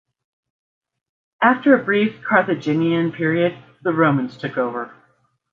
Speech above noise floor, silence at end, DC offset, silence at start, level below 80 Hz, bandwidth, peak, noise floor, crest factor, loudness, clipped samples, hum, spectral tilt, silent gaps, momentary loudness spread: 44 dB; 0.65 s; under 0.1%; 1.4 s; -66 dBFS; 7 kHz; -2 dBFS; -62 dBFS; 18 dB; -19 LUFS; under 0.1%; none; -8 dB/octave; none; 9 LU